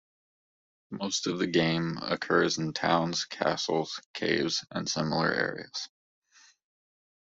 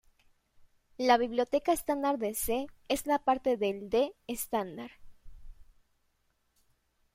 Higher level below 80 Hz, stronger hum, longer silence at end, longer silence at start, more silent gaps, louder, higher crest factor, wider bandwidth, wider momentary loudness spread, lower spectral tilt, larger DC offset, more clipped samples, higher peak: second, -68 dBFS vs -58 dBFS; neither; second, 1.35 s vs 1.5 s; first, 0.9 s vs 0.6 s; first, 4.06-4.14 s vs none; about the same, -29 LUFS vs -31 LUFS; about the same, 22 dB vs 20 dB; second, 8 kHz vs 16 kHz; about the same, 11 LU vs 9 LU; about the same, -4 dB/octave vs -3.5 dB/octave; neither; neither; about the same, -10 dBFS vs -12 dBFS